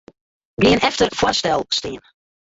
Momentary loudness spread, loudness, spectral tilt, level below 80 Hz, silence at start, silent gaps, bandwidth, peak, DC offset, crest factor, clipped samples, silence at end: 18 LU; -18 LUFS; -4 dB/octave; -44 dBFS; 0.6 s; none; 8 kHz; -2 dBFS; under 0.1%; 18 dB; under 0.1%; 0.55 s